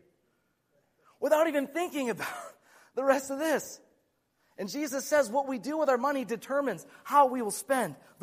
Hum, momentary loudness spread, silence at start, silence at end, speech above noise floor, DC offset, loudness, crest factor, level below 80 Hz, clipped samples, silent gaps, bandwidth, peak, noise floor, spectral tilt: none; 14 LU; 1.2 s; 0.25 s; 45 dB; under 0.1%; -29 LUFS; 20 dB; -78 dBFS; under 0.1%; none; 15.5 kHz; -10 dBFS; -74 dBFS; -3.5 dB/octave